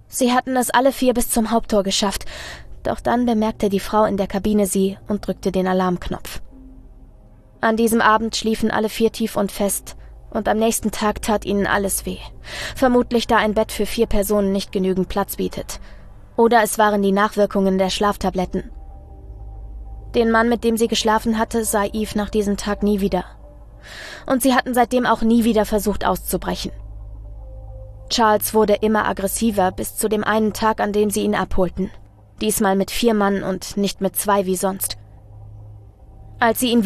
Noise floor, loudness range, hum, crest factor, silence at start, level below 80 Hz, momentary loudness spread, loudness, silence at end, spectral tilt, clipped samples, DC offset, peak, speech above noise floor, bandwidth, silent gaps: -46 dBFS; 3 LU; none; 18 dB; 0.1 s; -36 dBFS; 16 LU; -19 LUFS; 0 s; -4.5 dB/octave; under 0.1%; under 0.1%; -2 dBFS; 27 dB; 14 kHz; none